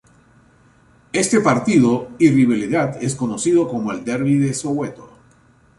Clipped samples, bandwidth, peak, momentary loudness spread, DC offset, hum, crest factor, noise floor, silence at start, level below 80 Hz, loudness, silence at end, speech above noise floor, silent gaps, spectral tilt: under 0.1%; 11.5 kHz; -2 dBFS; 9 LU; under 0.1%; none; 16 dB; -53 dBFS; 1.15 s; -54 dBFS; -18 LUFS; 0.75 s; 36 dB; none; -5.5 dB/octave